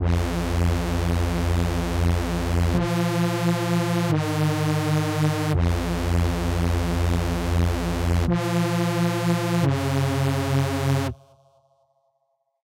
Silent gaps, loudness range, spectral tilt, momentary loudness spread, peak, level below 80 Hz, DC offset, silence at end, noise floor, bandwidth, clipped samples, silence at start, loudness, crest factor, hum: none; 1 LU; -6.5 dB/octave; 2 LU; -12 dBFS; -32 dBFS; under 0.1%; 1.5 s; -72 dBFS; 16 kHz; under 0.1%; 0 s; -23 LUFS; 12 dB; none